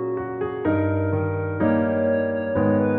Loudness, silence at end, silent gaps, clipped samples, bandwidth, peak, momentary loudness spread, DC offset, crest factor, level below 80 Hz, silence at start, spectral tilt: -23 LUFS; 0 s; none; under 0.1%; 4.1 kHz; -8 dBFS; 6 LU; under 0.1%; 14 dB; -52 dBFS; 0 s; -8.5 dB/octave